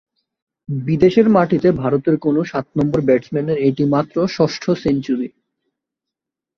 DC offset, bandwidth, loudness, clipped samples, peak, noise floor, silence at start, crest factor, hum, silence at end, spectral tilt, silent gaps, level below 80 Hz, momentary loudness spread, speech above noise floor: under 0.1%; 7.2 kHz; -17 LUFS; under 0.1%; -2 dBFS; -84 dBFS; 0.7 s; 16 dB; none; 1.3 s; -8 dB/octave; none; -50 dBFS; 9 LU; 68 dB